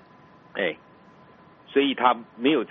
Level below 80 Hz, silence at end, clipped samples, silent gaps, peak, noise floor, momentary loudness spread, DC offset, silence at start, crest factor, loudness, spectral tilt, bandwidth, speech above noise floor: -74 dBFS; 0.05 s; under 0.1%; none; -6 dBFS; -52 dBFS; 12 LU; under 0.1%; 0.55 s; 20 dB; -24 LUFS; -2 dB/octave; 4.1 kHz; 29 dB